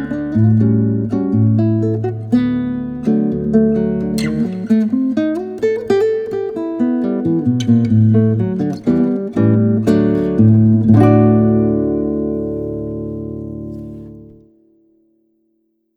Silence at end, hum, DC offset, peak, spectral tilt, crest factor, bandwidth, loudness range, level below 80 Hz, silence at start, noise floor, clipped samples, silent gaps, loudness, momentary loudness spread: 1.65 s; none; under 0.1%; 0 dBFS; -9.5 dB/octave; 14 dB; 9 kHz; 9 LU; -42 dBFS; 0 s; -64 dBFS; under 0.1%; none; -15 LUFS; 12 LU